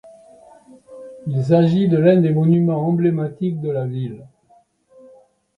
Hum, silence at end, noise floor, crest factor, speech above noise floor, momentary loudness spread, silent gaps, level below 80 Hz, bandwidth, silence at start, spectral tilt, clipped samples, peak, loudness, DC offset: none; 1.3 s; -56 dBFS; 16 dB; 39 dB; 17 LU; none; -60 dBFS; 5.6 kHz; 0.05 s; -10 dB/octave; under 0.1%; -2 dBFS; -18 LUFS; under 0.1%